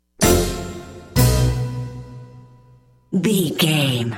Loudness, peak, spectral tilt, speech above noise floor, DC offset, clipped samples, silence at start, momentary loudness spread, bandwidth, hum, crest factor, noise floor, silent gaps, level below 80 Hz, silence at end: -19 LUFS; -2 dBFS; -5 dB/octave; 33 dB; under 0.1%; under 0.1%; 0.2 s; 19 LU; 17 kHz; none; 18 dB; -51 dBFS; none; -30 dBFS; 0 s